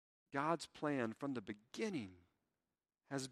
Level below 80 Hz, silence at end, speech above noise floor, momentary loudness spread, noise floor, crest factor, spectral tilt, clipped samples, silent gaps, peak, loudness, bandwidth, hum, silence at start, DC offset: -84 dBFS; 0 s; over 47 dB; 8 LU; under -90 dBFS; 22 dB; -5 dB/octave; under 0.1%; none; -22 dBFS; -43 LUFS; 13 kHz; none; 0.3 s; under 0.1%